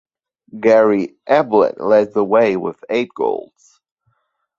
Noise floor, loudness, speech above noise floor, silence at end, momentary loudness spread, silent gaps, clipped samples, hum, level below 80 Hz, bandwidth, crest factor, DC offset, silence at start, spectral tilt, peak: -67 dBFS; -16 LUFS; 51 dB; 1.15 s; 9 LU; none; under 0.1%; none; -62 dBFS; 7.2 kHz; 16 dB; under 0.1%; 0.55 s; -7 dB/octave; -2 dBFS